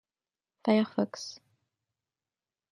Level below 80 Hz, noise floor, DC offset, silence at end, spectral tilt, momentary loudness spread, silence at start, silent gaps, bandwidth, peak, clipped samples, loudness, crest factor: -80 dBFS; under -90 dBFS; under 0.1%; 1.35 s; -5.5 dB/octave; 15 LU; 0.65 s; none; 10.5 kHz; -12 dBFS; under 0.1%; -30 LUFS; 22 dB